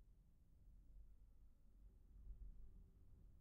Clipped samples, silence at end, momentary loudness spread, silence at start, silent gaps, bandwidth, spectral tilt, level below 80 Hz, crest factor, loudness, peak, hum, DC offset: under 0.1%; 0 s; 6 LU; 0 s; none; 1.8 kHz; -12 dB/octave; -64 dBFS; 16 dB; -66 LUFS; -46 dBFS; none; under 0.1%